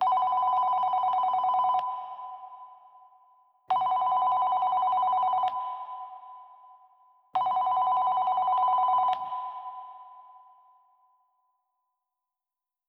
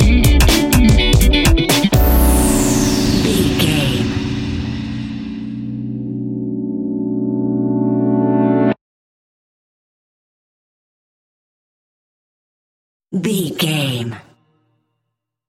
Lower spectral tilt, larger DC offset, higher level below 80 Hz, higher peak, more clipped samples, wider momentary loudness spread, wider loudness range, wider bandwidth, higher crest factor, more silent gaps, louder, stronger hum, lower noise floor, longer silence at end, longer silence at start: about the same, -4 dB/octave vs -5 dB/octave; neither; second, -82 dBFS vs -22 dBFS; second, -16 dBFS vs 0 dBFS; neither; first, 18 LU vs 13 LU; second, 4 LU vs 10 LU; second, 5.2 kHz vs 17 kHz; about the same, 12 dB vs 16 dB; second, none vs 8.81-13.00 s; second, -26 LUFS vs -16 LUFS; neither; first, under -90 dBFS vs -77 dBFS; first, 2.5 s vs 1.3 s; about the same, 0 s vs 0 s